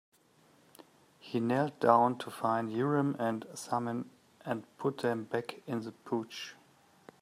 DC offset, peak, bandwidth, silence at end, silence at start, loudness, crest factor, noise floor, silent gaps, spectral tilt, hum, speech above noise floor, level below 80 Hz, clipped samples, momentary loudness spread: under 0.1%; -10 dBFS; 15.5 kHz; 0.7 s; 1.25 s; -33 LUFS; 24 dB; -65 dBFS; none; -6.5 dB/octave; none; 33 dB; -80 dBFS; under 0.1%; 14 LU